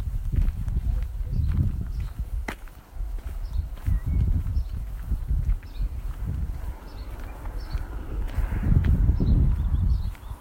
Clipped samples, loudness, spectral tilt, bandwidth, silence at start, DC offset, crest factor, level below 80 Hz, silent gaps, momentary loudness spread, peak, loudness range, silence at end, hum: under 0.1%; -29 LUFS; -8 dB/octave; 16 kHz; 0 s; under 0.1%; 16 dB; -26 dBFS; none; 15 LU; -8 dBFS; 7 LU; 0 s; none